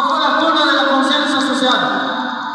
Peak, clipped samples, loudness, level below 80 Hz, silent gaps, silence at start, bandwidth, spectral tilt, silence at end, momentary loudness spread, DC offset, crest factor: -2 dBFS; under 0.1%; -14 LUFS; -70 dBFS; none; 0 s; 11 kHz; -2.5 dB/octave; 0 s; 6 LU; under 0.1%; 14 dB